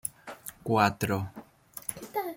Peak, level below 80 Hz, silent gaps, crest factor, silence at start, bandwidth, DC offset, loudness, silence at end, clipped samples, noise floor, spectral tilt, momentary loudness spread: -8 dBFS; -64 dBFS; none; 22 dB; 0.05 s; 16.5 kHz; under 0.1%; -30 LUFS; 0 s; under 0.1%; -49 dBFS; -5 dB/octave; 18 LU